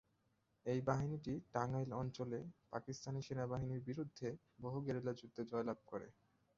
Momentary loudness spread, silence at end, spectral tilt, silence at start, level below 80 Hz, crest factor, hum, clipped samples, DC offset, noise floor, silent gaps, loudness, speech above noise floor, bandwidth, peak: 9 LU; 0.45 s; -7.5 dB/octave; 0.65 s; -70 dBFS; 22 dB; none; under 0.1%; under 0.1%; -81 dBFS; none; -45 LUFS; 38 dB; 7.6 kHz; -22 dBFS